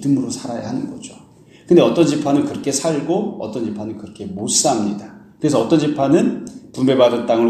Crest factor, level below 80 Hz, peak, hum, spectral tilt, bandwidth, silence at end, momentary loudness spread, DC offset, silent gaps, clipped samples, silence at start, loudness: 18 dB; -58 dBFS; 0 dBFS; none; -5 dB/octave; 14 kHz; 0 s; 16 LU; under 0.1%; none; under 0.1%; 0 s; -17 LUFS